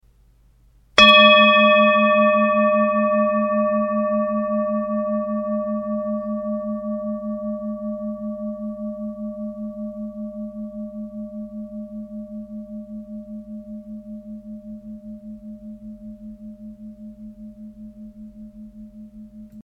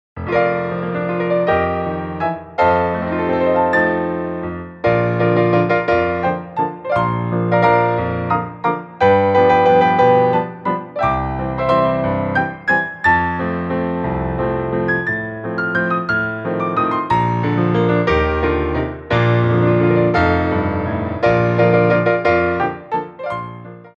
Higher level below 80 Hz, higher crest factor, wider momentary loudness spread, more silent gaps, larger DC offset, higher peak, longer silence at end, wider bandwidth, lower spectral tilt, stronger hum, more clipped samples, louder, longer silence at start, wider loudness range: second, -52 dBFS vs -38 dBFS; first, 22 dB vs 14 dB; first, 26 LU vs 9 LU; neither; neither; about the same, 0 dBFS vs -2 dBFS; about the same, 0 s vs 0.1 s; first, 9 kHz vs 7.4 kHz; second, -5 dB/octave vs -8.5 dB/octave; neither; neither; about the same, -18 LUFS vs -17 LUFS; first, 0.95 s vs 0.15 s; first, 24 LU vs 4 LU